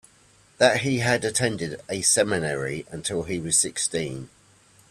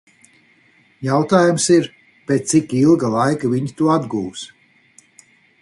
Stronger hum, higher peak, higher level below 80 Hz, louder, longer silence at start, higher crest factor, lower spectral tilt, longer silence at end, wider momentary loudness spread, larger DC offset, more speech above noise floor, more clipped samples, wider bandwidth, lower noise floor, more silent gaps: neither; about the same, -4 dBFS vs -2 dBFS; about the same, -56 dBFS vs -58 dBFS; second, -23 LUFS vs -17 LUFS; second, 0.6 s vs 1 s; about the same, 22 dB vs 18 dB; second, -3 dB/octave vs -5.5 dB/octave; second, 0.65 s vs 1.15 s; second, 11 LU vs 15 LU; neither; second, 33 dB vs 39 dB; neither; first, 15.5 kHz vs 11.5 kHz; about the same, -57 dBFS vs -55 dBFS; neither